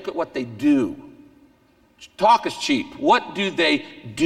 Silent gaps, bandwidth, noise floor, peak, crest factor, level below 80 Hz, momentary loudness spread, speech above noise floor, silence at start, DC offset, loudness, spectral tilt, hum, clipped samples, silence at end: none; 13 kHz; -58 dBFS; -4 dBFS; 18 dB; -60 dBFS; 11 LU; 37 dB; 0 s; under 0.1%; -21 LUFS; -4 dB/octave; none; under 0.1%; 0 s